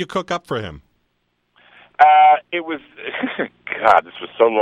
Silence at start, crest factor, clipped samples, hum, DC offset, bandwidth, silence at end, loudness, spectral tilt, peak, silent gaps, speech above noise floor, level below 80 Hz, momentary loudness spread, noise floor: 0 s; 18 dB; under 0.1%; 60 Hz at -65 dBFS; under 0.1%; 7.8 kHz; 0 s; -17 LUFS; -5 dB/octave; 0 dBFS; none; 52 dB; -56 dBFS; 18 LU; -69 dBFS